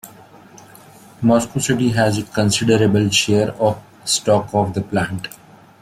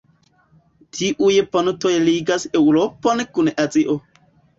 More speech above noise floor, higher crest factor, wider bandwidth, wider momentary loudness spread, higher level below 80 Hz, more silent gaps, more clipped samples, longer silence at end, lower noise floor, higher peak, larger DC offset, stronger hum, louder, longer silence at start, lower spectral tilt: second, 27 dB vs 40 dB; about the same, 16 dB vs 16 dB; first, 16 kHz vs 7.8 kHz; about the same, 7 LU vs 7 LU; first, -50 dBFS vs -58 dBFS; neither; neither; about the same, 0.55 s vs 0.6 s; second, -43 dBFS vs -58 dBFS; about the same, -2 dBFS vs -4 dBFS; neither; neither; about the same, -17 LUFS vs -18 LUFS; second, 0.05 s vs 0.95 s; about the same, -4.5 dB/octave vs -4.5 dB/octave